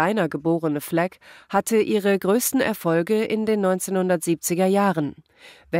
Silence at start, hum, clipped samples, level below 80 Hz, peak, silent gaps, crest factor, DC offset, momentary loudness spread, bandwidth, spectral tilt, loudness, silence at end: 0 s; none; under 0.1%; -64 dBFS; -6 dBFS; none; 16 dB; under 0.1%; 5 LU; 16 kHz; -5 dB/octave; -22 LUFS; 0 s